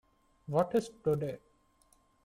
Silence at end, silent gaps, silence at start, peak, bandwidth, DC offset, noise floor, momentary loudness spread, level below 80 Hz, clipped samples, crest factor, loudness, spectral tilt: 0.85 s; none; 0.5 s; -16 dBFS; 16 kHz; under 0.1%; -69 dBFS; 17 LU; -66 dBFS; under 0.1%; 20 dB; -33 LUFS; -7.5 dB/octave